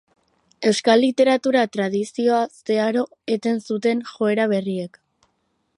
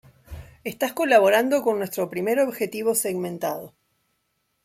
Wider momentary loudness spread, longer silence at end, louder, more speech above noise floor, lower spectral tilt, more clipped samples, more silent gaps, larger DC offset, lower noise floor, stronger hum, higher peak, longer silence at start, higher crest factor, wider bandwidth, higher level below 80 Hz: second, 8 LU vs 18 LU; about the same, 0.9 s vs 0.95 s; about the same, -21 LUFS vs -22 LUFS; about the same, 50 dB vs 51 dB; about the same, -5 dB/octave vs -4 dB/octave; neither; neither; neither; about the same, -70 dBFS vs -73 dBFS; neither; about the same, -2 dBFS vs -4 dBFS; first, 0.6 s vs 0.3 s; about the same, 18 dB vs 20 dB; second, 11.5 kHz vs 16.5 kHz; second, -72 dBFS vs -56 dBFS